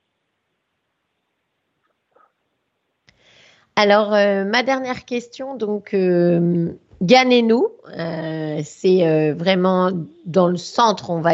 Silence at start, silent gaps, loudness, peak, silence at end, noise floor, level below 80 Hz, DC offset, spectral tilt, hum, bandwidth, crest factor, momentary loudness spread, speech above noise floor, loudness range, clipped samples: 3.75 s; none; -18 LUFS; 0 dBFS; 0 s; -73 dBFS; -64 dBFS; under 0.1%; -6 dB/octave; none; 7.8 kHz; 20 dB; 12 LU; 56 dB; 4 LU; under 0.1%